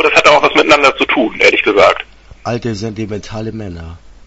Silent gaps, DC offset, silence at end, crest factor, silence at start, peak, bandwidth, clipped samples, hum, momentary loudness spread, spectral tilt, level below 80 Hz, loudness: none; under 0.1%; 0.2 s; 12 dB; 0 s; 0 dBFS; 11 kHz; 0.3%; none; 19 LU; -4 dB/octave; -40 dBFS; -10 LUFS